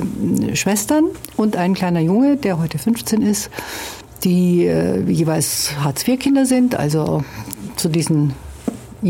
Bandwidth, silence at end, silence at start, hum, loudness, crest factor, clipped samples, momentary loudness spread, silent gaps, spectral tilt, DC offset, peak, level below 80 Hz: 17 kHz; 0 s; 0 s; none; -18 LUFS; 12 dB; under 0.1%; 12 LU; none; -5.5 dB/octave; under 0.1%; -4 dBFS; -44 dBFS